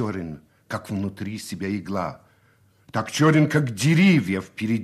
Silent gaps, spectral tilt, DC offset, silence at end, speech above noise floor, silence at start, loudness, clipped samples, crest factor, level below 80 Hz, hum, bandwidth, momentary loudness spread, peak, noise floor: none; -6 dB/octave; under 0.1%; 0 s; 37 dB; 0 s; -23 LUFS; under 0.1%; 18 dB; -58 dBFS; none; 13.5 kHz; 16 LU; -6 dBFS; -59 dBFS